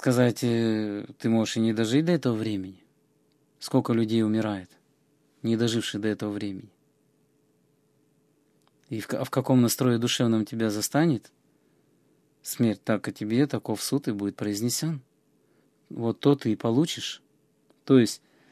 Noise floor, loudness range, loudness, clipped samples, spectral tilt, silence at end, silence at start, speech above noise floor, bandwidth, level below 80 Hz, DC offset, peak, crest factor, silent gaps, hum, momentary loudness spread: -67 dBFS; 6 LU; -26 LUFS; under 0.1%; -5.5 dB/octave; 0.35 s; 0 s; 42 dB; 15 kHz; -66 dBFS; under 0.1%; -8 dBFS; 20 dB; none; none; 12 LU